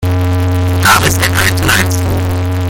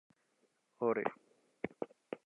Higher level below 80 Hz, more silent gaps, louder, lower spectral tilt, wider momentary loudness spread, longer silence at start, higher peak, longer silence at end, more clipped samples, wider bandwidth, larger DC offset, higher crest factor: first, -30 dBFS vs -82 dBFS; neither; first, -11 LUFS vs -40 LUFS; second, -4 dB/octave vs -8 dB/octave; second, 6 LU vs 12 LU; second, 0 s vs 0.8 s; first, 0 dBFS vs -20 dBFS; about the same, 0 s vs 0.1 s; first, 0.1% vs under 0.1%; first, 17.5 kHz vs 4.1 kHz; neither; second, 10 dB vs 22 dB